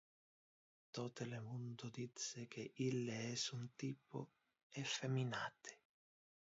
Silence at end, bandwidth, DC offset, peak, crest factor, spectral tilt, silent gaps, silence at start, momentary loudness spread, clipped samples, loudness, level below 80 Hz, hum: 0.75 s; 7.6 kHz; under 0.1%; -30 dBFS; 18 dB; -4.5 dB/octave; 4.63-4.70 s; 0.95 s; 11 LU; under 0.1%; -47 LUFS; -86 dBFS; none